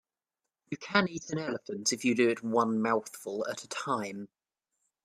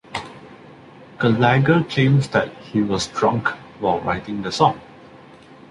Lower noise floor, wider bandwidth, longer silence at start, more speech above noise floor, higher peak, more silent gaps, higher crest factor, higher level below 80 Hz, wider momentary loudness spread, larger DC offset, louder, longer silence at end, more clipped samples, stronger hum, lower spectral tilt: first, -89 dBFS vs -44 dBFS; first, 14.5 kHz vs 11 kHz; first, 0.7 s vs 0.1 s; first, 59 dB vs 26 dB; second, -8 dBFS vs -2 dBFS; neither; first, 24 dB vs 18 dB; second, -76 dBFS vs -50 dBFS; first, 13 LU vs 10 LU; neither; second, -31 LUFS vs -19 LUFS; first, 0.8 s vs 0.55 s; neither; neither; second, -4 dB/octave vs -6 dB/octave